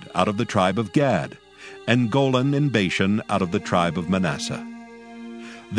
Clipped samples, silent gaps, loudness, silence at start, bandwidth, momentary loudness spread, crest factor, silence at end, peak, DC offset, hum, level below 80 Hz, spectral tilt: under 0.1%; none; -22 LUFS; 0 s; 10.5 kHz; 18 LU; 22 dB; 0 s; -2 dBFS; under 0.1%; 60 Hz at -45 dBFS; -56 dBFS; -6 dB/octave